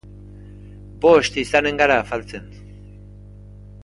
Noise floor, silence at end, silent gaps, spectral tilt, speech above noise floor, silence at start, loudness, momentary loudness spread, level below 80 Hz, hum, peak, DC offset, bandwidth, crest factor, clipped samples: -40 dBFS; 1.3 s; none; -4.5 dB/octave; 23 dB; 0.15 s; -18 LUFS; 17 LU; -44 dBFS; 50 Hz at -40 dBFS; 0 dBFS; under 0.1%; 11.5 kHz; 20 dB; under 0.1%